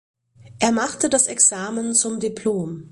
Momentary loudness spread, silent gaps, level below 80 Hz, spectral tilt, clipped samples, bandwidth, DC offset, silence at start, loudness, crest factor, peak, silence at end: 9 LU; none; -58 dBFS; -2.5 dB/octave; under 0.1%; 11.5 kHz; under 0.1%; 0.4 s; -19 LUFS; 20 dB; -2 dBFS; 0.05 s